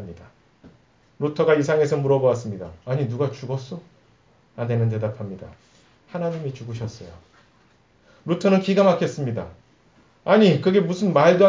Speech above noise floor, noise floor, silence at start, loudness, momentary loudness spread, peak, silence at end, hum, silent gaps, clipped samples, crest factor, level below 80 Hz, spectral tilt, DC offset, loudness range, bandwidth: 38 dB; -58 dBFS; 0 s; -21 LUFS; 19 LU; -2 dBFS; 0 s; none; none; under 0.1%; 20 dB; -56 dBFS; -7 dB/octave; under 0.1%; 9 LU; 7.6 kHz